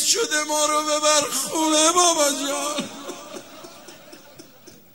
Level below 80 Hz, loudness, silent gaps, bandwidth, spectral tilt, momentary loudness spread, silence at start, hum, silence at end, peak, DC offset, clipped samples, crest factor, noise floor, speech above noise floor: -70 dBFS; -19 LUFS; none; 16 kHz; -0.5 dB/octave; 22 LU; 0 s; none; 0.25 s; -2 dBFS; 0.2%; under 0.1%; 20 dB; -48 dBFS; 27 dB